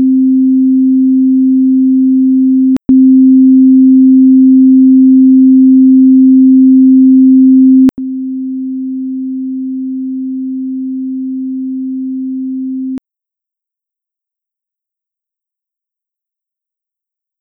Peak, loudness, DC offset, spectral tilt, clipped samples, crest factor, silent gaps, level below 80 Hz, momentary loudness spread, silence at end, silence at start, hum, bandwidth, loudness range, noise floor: 0 dBFS; -8 LUFS; under 0.1%; -10 dB/octave; under 0.1%; 8 dB; none; -54 dBFS; 13 LU; 4.45 s; 0 s; none; 0.9 kHz; 16 LU; -84 dBFS